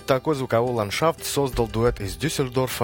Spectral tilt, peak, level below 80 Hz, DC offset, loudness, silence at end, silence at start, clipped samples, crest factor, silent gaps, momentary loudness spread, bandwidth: -5 dB/octave; -4 dBFS; -40 dBFS; under 0.1%; -24 LUFS; 0 s; 0 s; under 0.1%; 18 dB; none; 3 LU; 17 kHz